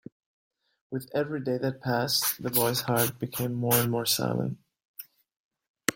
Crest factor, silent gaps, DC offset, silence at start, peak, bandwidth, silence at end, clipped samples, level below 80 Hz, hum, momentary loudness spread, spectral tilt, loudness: 26 dB; 4.85-4.94 s, 5.36-5.51 s, 5.68-5.74 s; under 0.1%; 0.9 s; -4 dBFS; 16.5 kHz; 0 s; under 0.1%; -64 dBFS; none; 17 LU; -4 dB/octave; -27 LUFS